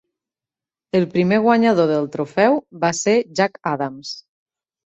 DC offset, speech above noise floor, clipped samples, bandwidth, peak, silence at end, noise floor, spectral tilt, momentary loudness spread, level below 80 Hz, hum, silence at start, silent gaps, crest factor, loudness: under 0.1%; 72 dB; under 0.1%; 8.2 kHz; -2 dBFS; 0.65 s; -90 dBFS; -5.5 dB/octave; 11 LU; -62 dBFS; none; 0.95 s; none; 18 dB; -18 LUFS